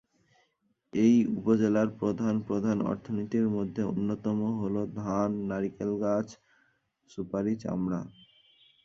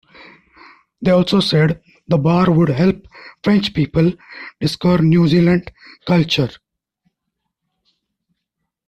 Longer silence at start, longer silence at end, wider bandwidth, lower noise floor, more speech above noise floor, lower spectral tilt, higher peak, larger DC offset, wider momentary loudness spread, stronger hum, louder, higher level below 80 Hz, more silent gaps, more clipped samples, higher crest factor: about the same, 0.95 s vs 1 s; second, 0.75 s vs 2.4 s; second, 7.2 kHz vs 10.5 kHz; about the same, -74 dBFS vs -77 dBFS; second, 45 dB vs 62 dB; about the same, -8 dB/octave vs -7.5 dB/octave; second, -12 dBFS vs -2 dBFS; neither; about the same, 9 LU vs 11 LU; neither; second, -29 LUFS vs -16 LUFS; second, -62 dBFS vs -46 dBFS; neither; neither; about the same, 18 dB vs 14 dB